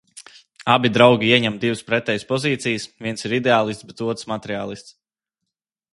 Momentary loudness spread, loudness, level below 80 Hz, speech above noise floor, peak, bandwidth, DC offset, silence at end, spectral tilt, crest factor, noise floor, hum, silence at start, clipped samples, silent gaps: 14 LU; -20 LUFS; -60 dBFS; 63 dB; 0 dBFS; 11.5 kHz; under 0.1%; 1 s; -5 dB/octave; 22 dB; -82 dBFS; none; 0.15 s; under 0.1%; none